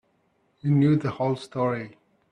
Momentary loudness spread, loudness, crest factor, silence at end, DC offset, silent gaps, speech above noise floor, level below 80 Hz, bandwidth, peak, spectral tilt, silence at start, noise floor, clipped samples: 12 LU; -25 LUFS; 16 dB; 0.4 s; under 0.1%; none; 45 dB; -64 dBFS; 9.8 kHz; -10 dBFS; -9 dB/octave; 0.65 s; -68 dBFS; under 0.1%